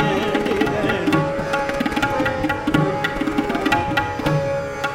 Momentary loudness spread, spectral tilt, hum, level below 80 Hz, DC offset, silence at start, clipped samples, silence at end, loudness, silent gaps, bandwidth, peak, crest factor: 3 LU; -6 dB/octave; none; -40 dBFS; under 0.1%; 0 s; under 0.1%; 0 s; -20 LUFS; none; 17 kHz; -4 dBFS; 16 dB